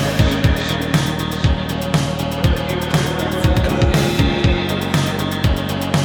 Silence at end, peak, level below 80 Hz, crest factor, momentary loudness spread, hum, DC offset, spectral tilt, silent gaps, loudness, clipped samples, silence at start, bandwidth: 0 s; -2 dBFS; -24 dBFS; 16 dB; 4 LU; none; under 0.1%; -5.5 dB/octave; none; -18 LUFS; under 0.1%; 0 s; over 20 kHz